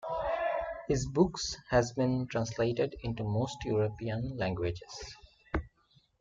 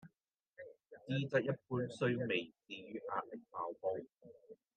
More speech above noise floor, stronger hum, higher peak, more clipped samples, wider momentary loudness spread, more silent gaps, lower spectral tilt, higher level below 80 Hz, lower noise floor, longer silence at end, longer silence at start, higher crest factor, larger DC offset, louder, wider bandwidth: second, 36 dB vs 44 dB; neither; first, -12 dBFS vs -20 dBFS; neither; second, 9 LU vs 21 LU; neither; about the same, -6 dB/octave vs -7 dB/octave; first, -50 dBFS vs -86 dBFS; second, -68 dBFS vs -84 dBFS; first, 0.5 s vs 0.25 s; about the same, 0 s vs 0.05 s; about the same, 20 dB vs 20 dB; neither; first, -33 LUFS vs -40 LUFS; about the same, 9.2 kHz vs 8.4 kHz